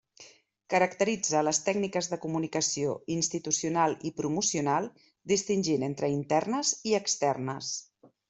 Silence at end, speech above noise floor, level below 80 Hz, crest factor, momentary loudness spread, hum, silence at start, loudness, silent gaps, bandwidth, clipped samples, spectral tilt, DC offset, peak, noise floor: 0.45 s; 27 dB; -70 dBFS; 18 dB; 7 LU; none; 0.2 s; -29 LUFS; none; 8.2 kHz; under 0.1%; -3.5 dB/octave; under 0.1%; -12 dBFS; -56 dBFS